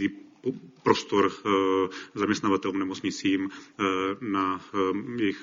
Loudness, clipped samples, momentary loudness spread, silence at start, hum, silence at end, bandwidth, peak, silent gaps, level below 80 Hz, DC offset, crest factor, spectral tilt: -27 LUFS; under 0.1%; 8 LU; 0 s; none; 0 s; 7.6 kHz; -6 dBFS; none; -66 dBFS; under 0.1%; 22 dB; -5 dB/octave